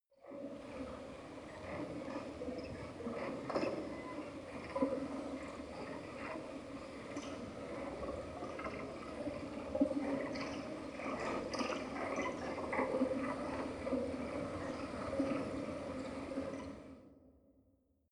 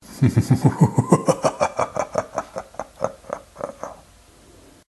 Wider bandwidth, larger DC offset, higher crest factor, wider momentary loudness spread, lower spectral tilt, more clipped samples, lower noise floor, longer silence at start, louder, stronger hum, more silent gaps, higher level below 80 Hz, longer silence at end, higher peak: about the same, 11.5 kHz vs 12.5 kHz; neither; about the same, 22 dB vs 22 dB; second, 10 LU vs 17 LU; about the same, -6 dB/octave vs -7 dB/octave; neither; first, -74 dBFS vs -50 dBFS; about the same, 0.2 s vs 0.1 s; second, -42 LUFS vs -21 LUFS; neither; neither; second, -64 dBFS vs -46 dBFS; second, 0.6 s vs 1 s; second, -20 dBFS vs 0 dBFS